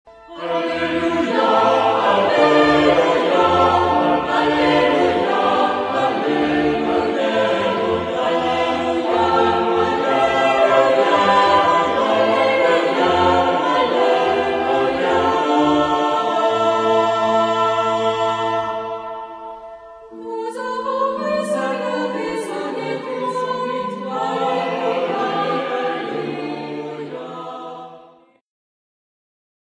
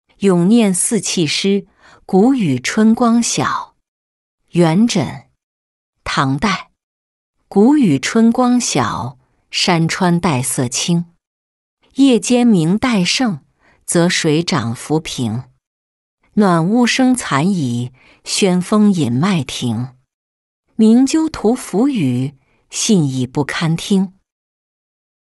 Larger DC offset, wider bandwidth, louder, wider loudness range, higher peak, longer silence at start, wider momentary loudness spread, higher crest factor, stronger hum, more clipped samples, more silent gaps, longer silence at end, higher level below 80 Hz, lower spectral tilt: neither; about the same, 11 kHz vs 12 kHz; about the same, -17 LUFS vs -15 LUFS; first, 9 LU vs 4 LU; about the same, -2 dBFS vs -2 dBFS; second, 0.05 s vs 0.2 s; about the same, 12 LU vs 10 LU; about the same, 16 dB vs 14 dB; neither; neither; second, none vs 3.88-4.38 s, 5.43-5.93 s, 6.83-7.33 s, 11.27-11.77 s, 15.67-16.18 s, 20.14-20.63 s; first, 1.7 s vs 1.15 s; about the same, -52 dBFS vs -50 dBFS; about the same, -5 dB/octave vs -5 dB/octave